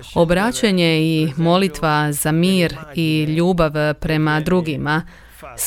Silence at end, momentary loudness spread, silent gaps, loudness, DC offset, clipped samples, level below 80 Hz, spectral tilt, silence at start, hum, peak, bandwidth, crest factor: 0 s; 5 LU; none; -17 LUFS; under 0.1%; under 0.1%; -38 dBFS; -5.5 dB/octave; 0 s; none; -2 dBFS; 17 kHz; 16 dB